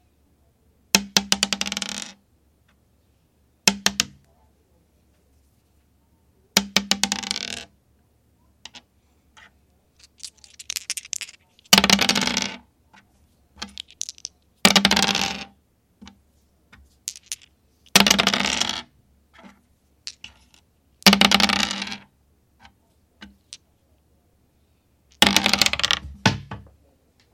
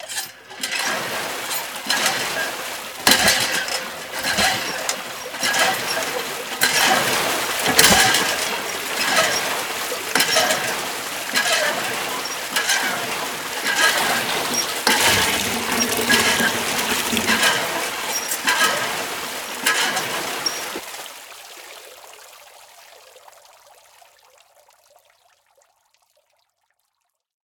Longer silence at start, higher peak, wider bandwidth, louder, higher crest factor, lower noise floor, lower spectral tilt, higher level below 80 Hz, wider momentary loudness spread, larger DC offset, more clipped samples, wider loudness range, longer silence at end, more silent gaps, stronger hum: first, 0.95 s vs 0 s; about the same, 0 dBFS vs 0 dBFS; second, 16.5 kHz vs over 20 kHz; about the same, -19 LUFS vs -19 LUFS; about the same, 26 dB vs 22 dB; second, -63 dBFS vs -74 dBFS; about the same, -1.5 dB/octave vs -0.5 dB/octave; about the same, -52 dBFS vs -54 dBFS; first, 24 LU vs 12 LU; neither; neither; about the same, 7 LU vs 7 LU; second, 0.75 s vs 4.25 s; neither; neither